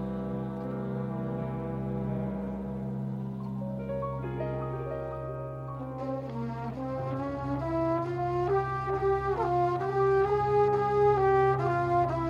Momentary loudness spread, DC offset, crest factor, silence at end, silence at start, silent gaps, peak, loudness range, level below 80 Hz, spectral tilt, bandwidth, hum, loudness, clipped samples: 11 LU; under 0.1%; 14 dB; 0 s; 0 s; none; -14 dBFS; 9 LU; -50 dBFS; -9 dB/octave; 7.2 kHz; none; -30 LUFS; under 0.1%